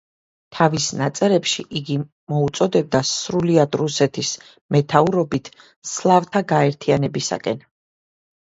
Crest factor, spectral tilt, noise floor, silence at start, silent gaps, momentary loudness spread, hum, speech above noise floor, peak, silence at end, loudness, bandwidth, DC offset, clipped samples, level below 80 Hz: 20 dB; -5 dB/octave; under -90 dBFS; 0.5 s; 2.12-2.27 s, 4.61-4.69 s, 5.76-5.82 s; 9 LU; none; over 71 dB; 0 dBFS; 0.9 s; -20 LUFS; 8 kHz; under 0.1%; under 0.1%; -56 dBFS